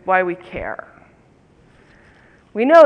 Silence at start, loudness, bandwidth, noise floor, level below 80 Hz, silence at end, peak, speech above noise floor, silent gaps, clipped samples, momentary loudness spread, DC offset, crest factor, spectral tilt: 0.05 s; -21 LUFS; 7.4 kHz; -52 dBFS; -52 dBFS; 0 s; 0 dBFS; 38 dB; none; under 0.1%; 16 LU; under 0.1%; 18 dB; -6 dB/octave